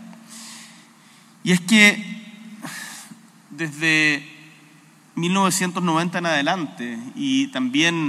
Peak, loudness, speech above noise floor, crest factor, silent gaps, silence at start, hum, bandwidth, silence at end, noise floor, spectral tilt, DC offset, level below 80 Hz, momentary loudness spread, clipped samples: 0 dBFS; -19 LUFS; 31 dB; 22 dB; none; 0 s; none; 15.5 kHz; 0 s; -51 dBFS; -3.5 dB/octave; under 0.1%; -82 dBFS; 23 LU; under 0.1%